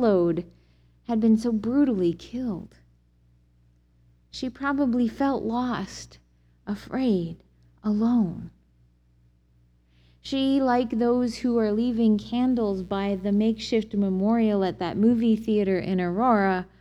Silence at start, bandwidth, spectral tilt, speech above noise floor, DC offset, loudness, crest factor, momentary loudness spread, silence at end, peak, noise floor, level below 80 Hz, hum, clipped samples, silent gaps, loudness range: 0 s; 8.6 kHz; -7 dB/octave; 37 dB; under 0.1%; -25 LUFS; 16 dB; 13 LU; 0.15 s; -10 dBFS; -61 dBFS; -52 dBFS; 60 Hz at -50 dBFS; under 0.1%; none; 6 LU